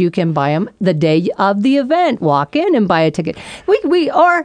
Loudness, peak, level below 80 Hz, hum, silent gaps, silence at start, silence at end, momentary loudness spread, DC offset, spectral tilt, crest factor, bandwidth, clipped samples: -14 LUFS; 0 dBFS; -54 dBFS; none; none; 0 s; 0 s; 5 LU; under 0.1%; -7 dB/octave; 12 dB; 10 kHz; under 0.1%